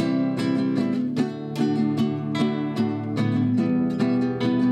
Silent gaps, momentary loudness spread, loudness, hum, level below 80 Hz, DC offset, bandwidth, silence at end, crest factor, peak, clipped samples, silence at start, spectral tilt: none; 4 LU; -24 LUFS; none; -62 dBFS; under 0.1%; 9.6 kHz; 0 s; 12 dB; -10 dBFS; under 0.1%; 0 s; -8 dB/octave